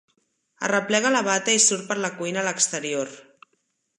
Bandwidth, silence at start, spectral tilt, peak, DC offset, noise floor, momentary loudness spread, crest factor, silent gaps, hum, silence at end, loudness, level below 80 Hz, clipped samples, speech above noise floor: 11.5 kHz; 0.6 s; -1.5 dB/octave; -4 dBFS; under 0.1%; -72 dBFS; 11 LU; 22 dB; none; none; 0.75 s; -22 LUFS; -78 dBFS; under 0.1%; 49 dB